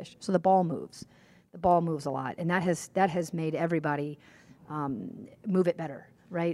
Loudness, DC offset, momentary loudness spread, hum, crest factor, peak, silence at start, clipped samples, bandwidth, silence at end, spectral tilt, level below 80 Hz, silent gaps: -30 LUFS; under 0.1%; 15 LU; none; 20 dB; -10 dBFS; 0 s; under 0.1%; 13 kHz; 0 s; -6.5 dB/octave; -64 dBFS; none